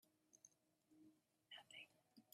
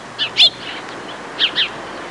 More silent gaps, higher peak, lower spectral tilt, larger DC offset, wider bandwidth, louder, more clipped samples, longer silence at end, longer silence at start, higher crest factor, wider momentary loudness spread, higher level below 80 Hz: neither; second, -48 dBFS vs -2 dBFS; about the same, -1 dB/octave vs -1 dB/octave; neither; first, 13 kHz vs 11.5 kHz; second, -63 LUFS vs -14 LUFS; neither; about the same, 0 s vs 0 s; about the same, 0 s vs 0 s; about the same, 20 dB vs 18 dB; second, 10 LU vs 18 LU; second, under -90 dBFS vs -56 dBFS